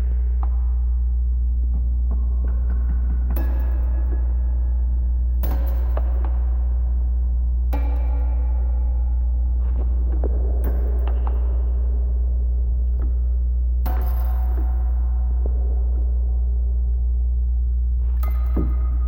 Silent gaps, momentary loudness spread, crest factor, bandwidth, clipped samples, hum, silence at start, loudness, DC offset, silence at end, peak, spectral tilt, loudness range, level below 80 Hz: none; 0 LU; 10 dB; 16.5 kHz; under 0.1%; 60 Hz at -20 dBFS; 0 s; -23 LUFS; 0.2%; 0 s; -10 dBFS; -10 dB/octave; 0 LU; -20 dBFS